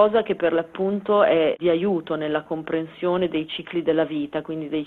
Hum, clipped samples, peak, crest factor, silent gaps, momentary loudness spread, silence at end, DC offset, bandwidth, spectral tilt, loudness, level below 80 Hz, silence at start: none; under 0.1%; -4 dBFS; 18 dB; none; 9 LU; 0 s; under 0.1%; 4.3 kHz; -8.5 dB/octave; -23 LUFS; -60 dBFS; 0 s